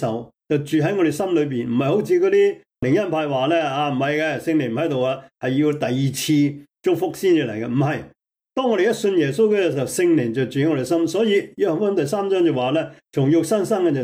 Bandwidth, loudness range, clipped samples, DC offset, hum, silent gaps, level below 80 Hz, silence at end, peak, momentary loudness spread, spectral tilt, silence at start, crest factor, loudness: 16.5 kHz; 2 LU; under 0.1%; under 0.1%; none; none; -60 dBFS; 0 s; -8 dBFS; 6 LU; -6 dB/octave; 0 s; 12 dB; -20 LUFS